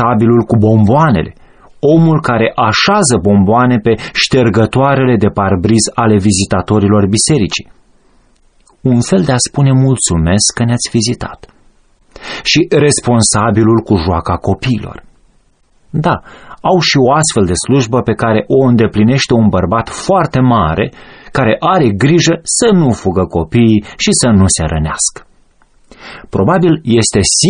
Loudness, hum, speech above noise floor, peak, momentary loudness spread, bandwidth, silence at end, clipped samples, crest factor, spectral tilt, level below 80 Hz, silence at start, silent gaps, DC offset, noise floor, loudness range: -11 LUFS; none; 40 dB; 0 dBFS; 7 LU; 10 kHz; 0 s; under 0.1%; 10 dB; -5 dB/octave; -34 dBFS; 0 s; none; under 0.1%; -51 dBFS; 3 LU